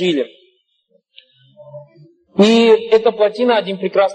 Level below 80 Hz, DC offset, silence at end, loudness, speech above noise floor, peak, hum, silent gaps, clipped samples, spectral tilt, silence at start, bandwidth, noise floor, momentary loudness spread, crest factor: -66 dBFS; under 0.1%; 0 s; -14 LUFS; 48 dB; -2 dBFS; none; none; under 0.1%; -5.5 dB/octave; 0 s; 10 kHz; -61 dBFS; 11 LU; 14 dB